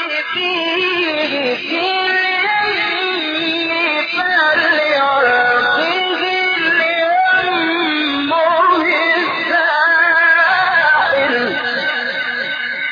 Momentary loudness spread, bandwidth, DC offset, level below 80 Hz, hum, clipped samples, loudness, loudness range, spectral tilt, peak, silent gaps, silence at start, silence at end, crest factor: 6 LU; 5.2 kHz; under 0.1%; -62 dBFS; none; under 0.1%; -14 LUFS; 3 LU; -4 dB/octave; -2 dBFS; none; 0 s; 0 s; 12 dB